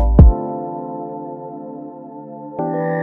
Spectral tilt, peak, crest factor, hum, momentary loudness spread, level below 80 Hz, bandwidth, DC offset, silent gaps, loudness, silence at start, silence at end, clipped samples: -13 dB/octave; 0 dBFS; 16 dB; none; 21 LU; -20 dBFS; 2.3 kHz; under 0.1%; none; -19 LUFS; 0 s; 0 s; under 0.1%